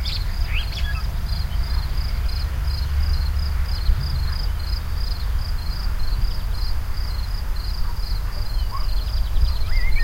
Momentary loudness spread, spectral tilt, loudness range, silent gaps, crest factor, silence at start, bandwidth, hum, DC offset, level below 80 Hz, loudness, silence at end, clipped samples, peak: 4 LU; -5 dB/octave; 3 LU; none; 14 dB; 0 s; 16 kHz; none; under 0.1%; -22 dBFS; -26 LUFS; 0 s; under 0.1%; -6 dBFS